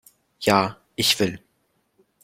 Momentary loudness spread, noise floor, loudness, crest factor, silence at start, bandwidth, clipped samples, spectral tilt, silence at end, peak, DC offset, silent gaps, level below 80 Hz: 8 LU; -69 dBFS; -22 LUFS; 24 dB; 0.4 s; 16.5 kHz; under 0.1%; -3.5 dB/octave; 0.85 s; -2 dBFS; under 0.1%; none; -58 dBFS